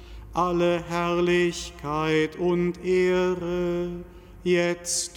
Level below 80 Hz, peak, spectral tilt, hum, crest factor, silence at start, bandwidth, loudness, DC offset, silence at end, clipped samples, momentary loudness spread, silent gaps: -46 dBFS; -10 dBFS; -5 dB/octave; none; 14 dB; 0 s; 14 kHz; -25 LUFS; under 0.1%; 0 s; under 0.1%; 9 LU; none